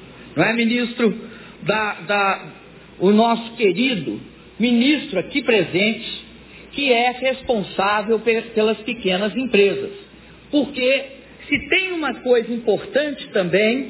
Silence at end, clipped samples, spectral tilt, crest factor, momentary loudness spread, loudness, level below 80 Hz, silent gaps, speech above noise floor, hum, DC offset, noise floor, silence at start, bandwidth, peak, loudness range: 0 s; under 0.1%; -9 dB/octave; 18 dB; 12 LU; -19 LUFS; -54 dBFS; none; 23 dB; none; under 0.1%; -42 dBFS; 0 s; 4 kHz; -2 dBFS; 2 LU